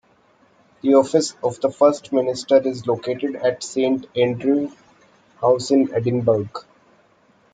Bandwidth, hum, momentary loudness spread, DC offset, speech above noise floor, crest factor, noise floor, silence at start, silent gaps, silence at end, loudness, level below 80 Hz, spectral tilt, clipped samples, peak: 9.4 kHz; none; 7 LU; under 0.1%; 38 dB; 18 dB; -57 dBFS; 0.85 s; none; 0.9 s; -20 LUFS; -64 dBFS; -6 dB/octave; under 0.1%; -2 dBFS